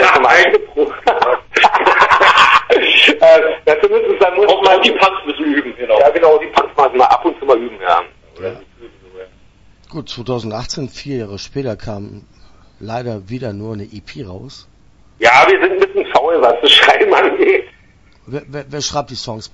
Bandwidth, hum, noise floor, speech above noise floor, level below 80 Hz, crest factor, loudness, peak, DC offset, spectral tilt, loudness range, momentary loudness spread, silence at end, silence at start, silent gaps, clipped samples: 11 kHz; none; -47 dBFS; 32 dB; -46 dBFS; 14 dB; -11 LUFS; 0 dBFS; under 0.1%; -3.5 dB/octave; 17 LU; 20 LU; 0.05 s; 0 s; none; 0.1%